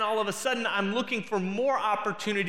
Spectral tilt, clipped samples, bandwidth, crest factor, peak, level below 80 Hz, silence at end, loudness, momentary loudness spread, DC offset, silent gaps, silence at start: -4 dB/octave; under 0.1%; 16 kHz; 16 dB; -12 dBFS; -78 dBFS; 0 s; -28 LUFS; 3 LU; 0.3%; none; 0 s